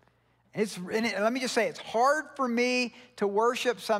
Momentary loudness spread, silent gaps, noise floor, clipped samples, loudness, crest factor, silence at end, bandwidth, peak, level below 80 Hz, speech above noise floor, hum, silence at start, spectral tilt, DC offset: 7 LU; none; -67 dBFS; under 0.1%; -28 LUFS; 16 dB; 0 s; 16 kHz; -12 dBFS; -76 dBFS; 39 dB; none; 0.55 s; -3.5 dB/octave; under 0.1%